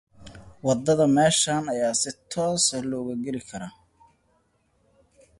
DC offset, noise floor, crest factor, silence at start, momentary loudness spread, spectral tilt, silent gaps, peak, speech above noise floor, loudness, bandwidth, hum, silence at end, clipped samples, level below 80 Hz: under 0.1%; -67 dBFS; 18 dB; 0.2 s; 14 LU; -3.5 dB/octave; none; -8 dBFS; 43 dB; -23 LUFS; 11.5 kHz; none; 1.7 s; under 0.1%; -58 dBFS